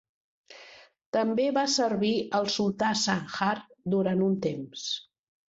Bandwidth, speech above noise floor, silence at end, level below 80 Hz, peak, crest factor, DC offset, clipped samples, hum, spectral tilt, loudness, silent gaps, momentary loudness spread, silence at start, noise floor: 7.8 kHz; 25 dB; 0.45 s; -68 dBFS; -10 dBFS; 18 dB; under 0.1%; under 0.1%; none; -4.5 dB/octave; -28 LUFS; 1.06-1.13 s; 9 LU; 0.5 s; -53 dBFS